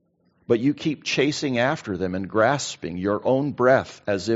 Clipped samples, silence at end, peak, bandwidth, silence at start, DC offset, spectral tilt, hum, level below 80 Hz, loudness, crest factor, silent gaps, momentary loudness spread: under 0.1%; 0 s; -4 dBFS; 8 kHz; 0.5 s; under 0.1%; -4.5 dB/octave; none; -62 dBFS; -23 LUFS; 18 dB; none; 8 LU